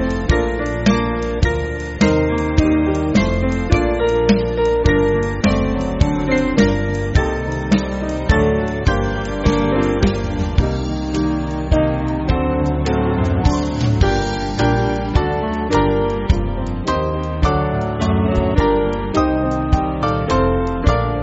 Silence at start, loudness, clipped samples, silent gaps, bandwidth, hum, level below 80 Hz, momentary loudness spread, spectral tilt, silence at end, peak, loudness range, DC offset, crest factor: 0 s; -18 LUFS; under 0.1%; none; 8 kHz; none; -24 dBFS; 5 LU; -6 dB/octave; 0 s; 0 dBFS; 2 LU; under 0.1%; 16 dB